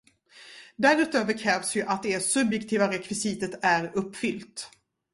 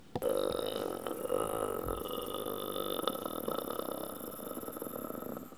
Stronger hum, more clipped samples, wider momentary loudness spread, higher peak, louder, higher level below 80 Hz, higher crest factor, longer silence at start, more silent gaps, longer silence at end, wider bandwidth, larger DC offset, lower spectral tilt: neither; neither; first, 17 LU vs 8 LU; first, -6 dBFS vs -14 dBFS; first, -26 LUFS vs -37 LUFS; second, -66 dBFS vs -58 dBFS; about the same, 20 dB vs 24 dB; first, 0.35 s vs 0 s; neither; first, 0.45 s vs 0 s; second, 11.5 kHz vs over 20 kHz; second, under 0.1% vs 0.1%; about the same, -3.5 dB/octave vs -4 dB/octave